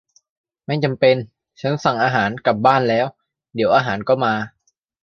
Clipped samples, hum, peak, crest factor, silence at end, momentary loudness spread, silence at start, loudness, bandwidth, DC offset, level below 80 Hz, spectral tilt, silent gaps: under 0.1%; none; -2 dBFS; 18 dB; 0.55 s; 11 LU; 0.7 s; -18 LUFS; 7 kHz; under 0.1%; -58 dBFS; -6.5 dB/octave; none